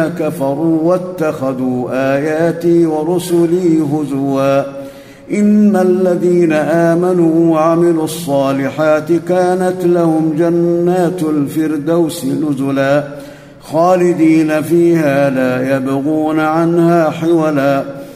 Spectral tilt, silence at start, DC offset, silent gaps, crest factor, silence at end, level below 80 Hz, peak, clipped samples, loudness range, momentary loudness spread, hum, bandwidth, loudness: -7 dB/octave; 0 s; under 0.1%; none; 12 dB; 0 s; -54 dBFS; 0 dBFS; under 0.1%; 2 LU; 6 LU; none; 15.5 kHz; -13 LUFS